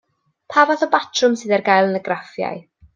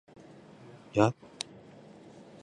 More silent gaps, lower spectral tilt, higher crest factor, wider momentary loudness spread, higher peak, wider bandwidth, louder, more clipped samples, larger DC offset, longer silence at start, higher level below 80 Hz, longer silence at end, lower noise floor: neither; second, -4 dB/octave vs -6 dB/octave; second, 18 dB vs 28 dB; second, 11 LU vs 25 LU; first, -2 dBFS vs -8 dBFS; second, 9.2 kHz vs 11.5 kHz; first, -18 LUFS vs -31 LUFS; neither; neither; second, 0.5 s vs 0.95 s; about the same, -64 dBFS vs -66 dBFS; second, 0.35 s vs 1.3 s; second, -41 dBFS vs -52 dBFS